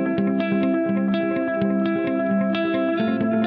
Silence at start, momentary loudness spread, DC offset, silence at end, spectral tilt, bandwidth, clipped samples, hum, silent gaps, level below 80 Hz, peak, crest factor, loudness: 0 s; 1 LU; under 0.1%; 0 s; -6 dB/octave; 5 kHz; under 0.1%; none; none; -62 dBFS; -10 dBFS; 12 dB; -22 LUFS